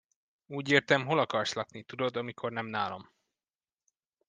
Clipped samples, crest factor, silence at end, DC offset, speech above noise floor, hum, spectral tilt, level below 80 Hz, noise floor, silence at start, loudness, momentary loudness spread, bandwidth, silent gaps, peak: under 0.1%; 26 dB; 1.25 s; under 0.1%; over 59 dB; none; -4.5 dB/octave; -78 dBFS; under -90 dBFS; 0.5 s; -31 LUFS; 14 LU; 9.8 kHz; none; -6 dBFS